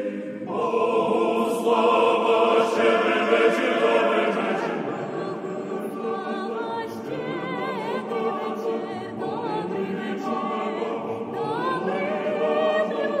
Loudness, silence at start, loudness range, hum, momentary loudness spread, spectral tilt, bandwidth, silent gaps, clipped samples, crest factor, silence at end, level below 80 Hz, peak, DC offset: -24 LUFS; 0 s; 9 LU; none; 11 LU; -5.5 dB/octave; 14 kHz; none; under 0.1%; 16 dB; 0 s; -74 dBFS; -6 dBFS; under 0.1%